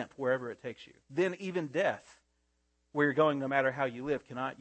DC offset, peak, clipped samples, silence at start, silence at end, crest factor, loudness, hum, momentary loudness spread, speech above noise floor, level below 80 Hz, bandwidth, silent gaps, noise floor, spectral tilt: under 0.1%; -14 dBFS; under 0.1%; 0 s; 0.1 s; 20 dB; -32 LUFS; none; 14 LU; 44 dB; -74 dBFS; 8.8 kHz; none; -76 dBFS; -6.5 dB/octave